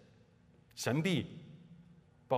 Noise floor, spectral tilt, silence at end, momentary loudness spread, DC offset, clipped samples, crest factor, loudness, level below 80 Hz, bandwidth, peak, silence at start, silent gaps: -65 dBFS; -5.5 dB/octave; 0 s; 24 LU; under 0.1%; under 0.1%; 22 dB; -36 LUFS; -74 dBFS; 15.5 kHz; -16 dBFS; 0.75 s; none